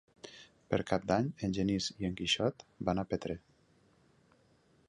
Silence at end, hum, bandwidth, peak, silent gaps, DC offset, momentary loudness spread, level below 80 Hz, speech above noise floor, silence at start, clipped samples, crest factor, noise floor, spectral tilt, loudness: 1.5 s; none; 11 kHz; -14 dBFS; none; under 0.1%; 18 LU; -58 dBFS; 34 dB; 0.25 s; under 0.1%; 22 dB; -68 dBFS; -5 dB/octave; -34 LUFS